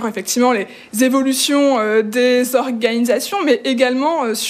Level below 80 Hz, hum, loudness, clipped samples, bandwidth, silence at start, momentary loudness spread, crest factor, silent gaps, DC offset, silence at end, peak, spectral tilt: -68 dBFS; none; -16 LUFS; under 0.1%; 15.5 kHz; 0 s; 4 LU; 16 dB; none; under 0.1%; 0 s; 0 dBFS; -2.5 dB/octave